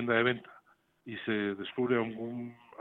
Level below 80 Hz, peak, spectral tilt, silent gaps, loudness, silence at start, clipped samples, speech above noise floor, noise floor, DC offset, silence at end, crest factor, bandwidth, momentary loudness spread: -74 dBFS; -14 dBFS; -8.5 dB/octave; none; -33 LUFS; 0 s; under 0.1%; 32 dB; -64 dBFS; under 0.1%; 0.25 s; 18 dB; 4.1 kHz; 16 LU